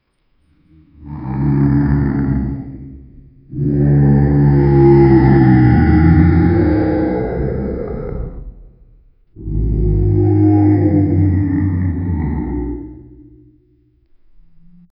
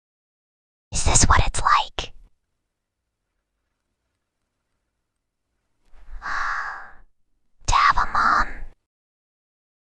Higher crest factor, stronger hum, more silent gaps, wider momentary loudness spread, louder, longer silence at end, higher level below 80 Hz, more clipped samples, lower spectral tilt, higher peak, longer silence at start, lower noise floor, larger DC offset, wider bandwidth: second, 14 dB vs 24 dB; neither; neither; about the same, 17 LU vs 16 LU; first, -14 LUFS vs -20 LUFS; first, 2 s vs 1.2 s; first, -24 dBFS vs -32 dBFS; neither; first, -14.5 dB/octave vs -2.5 dB/octave; about the same, 0 dBFS vs 0 dBFS; about the same, 1 s vs 0.9 s; second, -59 dBFS vs -80 dBFS; neither; second, 5.4 kHz vs 10 kHz